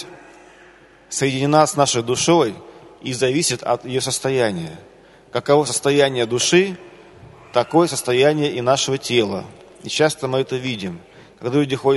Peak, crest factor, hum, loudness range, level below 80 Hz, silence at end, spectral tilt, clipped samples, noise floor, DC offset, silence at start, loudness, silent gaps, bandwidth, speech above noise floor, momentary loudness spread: 0 dBFS; 20 dB; none; 3 LU; -58 dBFS; 0 s; -4 dB/octave; under 0.1%; -48 dBFS; under 0.1%; 0 s; -19 LUFS; none; 12 kHz; 29 dB; 14 LU